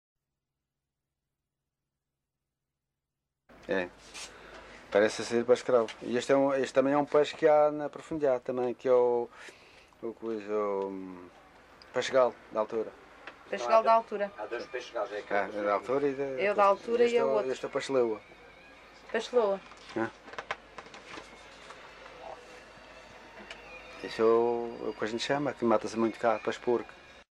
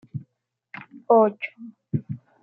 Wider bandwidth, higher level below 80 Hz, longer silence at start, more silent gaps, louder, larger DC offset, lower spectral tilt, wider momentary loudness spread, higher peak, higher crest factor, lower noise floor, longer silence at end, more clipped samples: first, 11 kHz vs 4.6 kHz; about the same, -68 dBFS vs -70 dBFS; first, 3.65 s vs 0.15 s; neither; second, -29 LUFS vs -23 LUFS; neither; second, -5 dB/octave vs -11 dB/octave; about the same, 22 LU vs 24 LU; about the same, -8 dBFS vs -6 dBFS; about the same, 22 dB vs 20 dB; first, -87 dBFS vs -75 dBFS; second, 0.1 s vs 0.25 s; neither